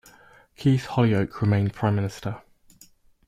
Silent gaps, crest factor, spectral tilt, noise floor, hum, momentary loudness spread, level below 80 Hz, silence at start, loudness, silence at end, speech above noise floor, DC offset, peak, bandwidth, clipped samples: none; 16 dB; -8 dB/octave; -55 dBFS; none; 13 LU; -54 dBFS; 0.6 s; -24 LUFS; 0.9 s; 33 dB; under 0.1%; -8 dBFS; 13.5 kHz; under 0.1%